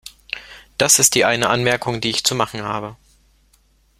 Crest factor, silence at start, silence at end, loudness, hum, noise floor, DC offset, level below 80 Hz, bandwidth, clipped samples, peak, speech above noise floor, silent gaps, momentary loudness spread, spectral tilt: 20 dB; 0.05 s; 1.05 s; -16 LUFS; none; -58 dBFS; under 0.1%; -52 dBFS; 16.5 kHz; under 0.1%; 0 dBFS; 40 dB; none; 19 LU; -2 dB/octave